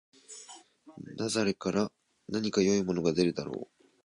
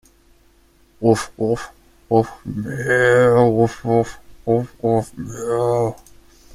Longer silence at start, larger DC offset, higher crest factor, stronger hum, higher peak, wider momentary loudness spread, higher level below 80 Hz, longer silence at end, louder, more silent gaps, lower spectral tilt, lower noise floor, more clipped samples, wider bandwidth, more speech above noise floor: second, 0.3 s vs 1 s; neither; about the same, 18 dB vs 18 dB; neither; second, -14 dBFS vs -2 dBFS; first, 22 LU vs 15 LU; second, -64 dBFS vs -48 dBFS; second, 0.4 s vs 0.6 s; second, -30 LUFS vs -19 LUFS; neither; second, -5 dB/octave vs -6.5 dB/octave; about the same, -53 dBFS vs -54 dBFS; neither; second, 11 kHz vs 14.5 kHz; second, 24 dB vs 36 dB